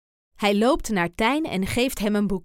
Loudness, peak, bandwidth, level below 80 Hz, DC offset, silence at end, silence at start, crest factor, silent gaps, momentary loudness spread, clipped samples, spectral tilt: -23 LUFS; -8 dBFS; 17 kHz; -40 dBFS; under 0.1%; 0.05 s; 0.4 s; 16 dB; none; 4 LU; under 0.1%; -5 dB/octave